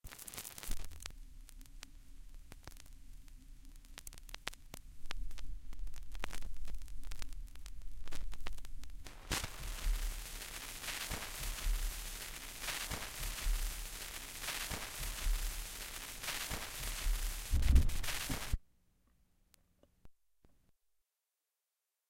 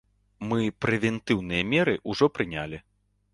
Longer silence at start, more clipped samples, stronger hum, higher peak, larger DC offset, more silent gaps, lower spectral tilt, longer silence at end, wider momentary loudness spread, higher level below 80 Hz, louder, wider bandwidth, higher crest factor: second, 0.05 s vs 0.4 s; neither; neither; second, -14 dBFS vs -8 dBFS; neither; neither; second, -2.5 dB/octave vs -6 dB/octave; first, 2 s vs 0.55 s; first, 17 LU vs 12 LU; first, -42 dBFS vs -54 dBFS; second, -42 LUFS vs -26 LUFS; first, 17 kHz vs 11.5 kHz; first, 26 dB vs 20 dB